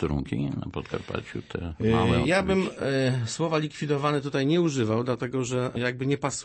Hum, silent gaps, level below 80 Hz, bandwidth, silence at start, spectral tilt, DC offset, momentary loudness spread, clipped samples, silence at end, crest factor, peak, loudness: none; none; -46 dBFS; 8.8 kHz; 0 s; -6 dB/octave; under 0.1%; 11 LU; under 0.1%; 0 s; 16 dB; -10 dBFS; -27 LUFS